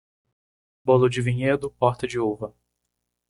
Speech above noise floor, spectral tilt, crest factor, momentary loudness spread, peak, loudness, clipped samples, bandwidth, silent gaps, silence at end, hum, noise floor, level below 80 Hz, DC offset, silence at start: 57 dB; -7 dB/octave; 20 dB; 12 LU; -4 dBFS; -23 LUFS; under 0.1%; 11.5 kHz; none; 0.8 s; 60 Hz at -40 dBFS; -80 dBFS; -56 dBFS; under 0.1%; 0.85 s